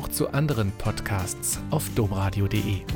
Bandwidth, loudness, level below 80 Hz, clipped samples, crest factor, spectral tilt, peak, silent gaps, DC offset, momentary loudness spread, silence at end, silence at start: 17.5 kHz; -26 LUFS; -40 dBFS; under 0.1%; 14 dB; -5 dB/octave; -12 dBFS; none; under 0.1%; 3 LU; 0 s; 0 s